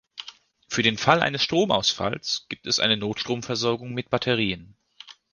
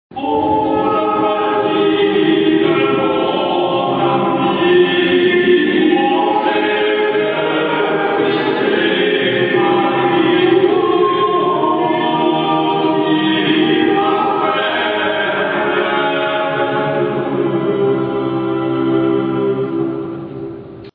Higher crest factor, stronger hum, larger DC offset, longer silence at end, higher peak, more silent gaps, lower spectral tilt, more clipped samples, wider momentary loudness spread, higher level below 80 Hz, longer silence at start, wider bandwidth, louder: first, 24 dB vs 14 dB; neither; neither; first, 0.2 s vs 0.05 s; about the same, -2 dBFS vs -2 dBFS; neither; second, -3.5 dB/octave vs -9 dB/octave; neither; first, 10 LU vs 5 LU; about the same, -56 dBFS vs -54 dBFS; about the same, 0.15 s vs 0.1 s; first, 10.5 kHz vs 4.9 kHz; second, -23 LUFS vs -15 LUFS